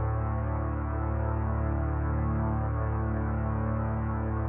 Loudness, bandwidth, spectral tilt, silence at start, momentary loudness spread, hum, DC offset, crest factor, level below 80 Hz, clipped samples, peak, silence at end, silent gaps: -30 LUFS; 2.9 kHz; -13 dB/octave; 0 s; 2 LU; none; under 0.1%; 10 dB; -34 dBFS; under 0.1%; -18 dBFS; 0 s; none